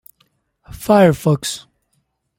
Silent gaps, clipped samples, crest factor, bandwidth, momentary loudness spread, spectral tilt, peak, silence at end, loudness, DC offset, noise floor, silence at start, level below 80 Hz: none; under 0.1%; 16 dB; 17 kHz; 18 LU; -6 dB/octave; -2 dBFS; 0.8 s; -15 LUFS; under 0.1%; -67 dBFS; 0.7 s; -48 dBFS